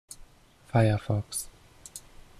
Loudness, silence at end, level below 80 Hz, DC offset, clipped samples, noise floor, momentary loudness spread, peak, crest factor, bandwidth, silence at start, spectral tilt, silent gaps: -28 LUFS; 0.4 s; -50 dBFS; under 0.1%; under 0.1%; -56 dBFS; 23 LU; -10 dBFS; 20 dB; 14.5 kHz; 0.2 s; -6 dB/octave; none